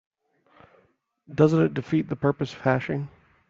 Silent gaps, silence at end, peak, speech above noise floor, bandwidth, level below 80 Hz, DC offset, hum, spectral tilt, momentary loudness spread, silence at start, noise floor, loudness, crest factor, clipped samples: none; 0.45 s; -6 dBFS; 42 dB; 7.4 kHz; -60 dBFS; under 0.1%; none; -8.5 dB/octave; 12 LU; 1.3 s; -65 dBFS; -25 LUFS; 20 dB; under 0.1%